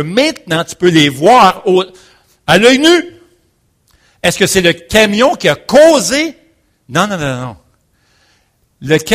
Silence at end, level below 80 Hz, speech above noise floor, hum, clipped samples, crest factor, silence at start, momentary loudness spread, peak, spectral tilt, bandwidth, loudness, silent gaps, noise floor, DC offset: 0 s; -42 dBFS; 47 dB; none; 0.6%; 12 dB; 0 s; 13 LU; 0 dBFS; -4 dB/octave; 16 kHz; -10 LUFS; none; -57 dBFS; under 0.1%